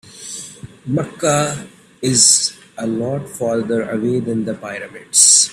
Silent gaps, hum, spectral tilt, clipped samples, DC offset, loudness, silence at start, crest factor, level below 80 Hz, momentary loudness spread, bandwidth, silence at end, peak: none; none; -2.5 dB/octave; under 0.1%; under 0.1%; -15 LUFS; 0.05 s; 18 dB; -56 dBFS; 20 LU; over 20 kHz; 0 s; 0 dBFS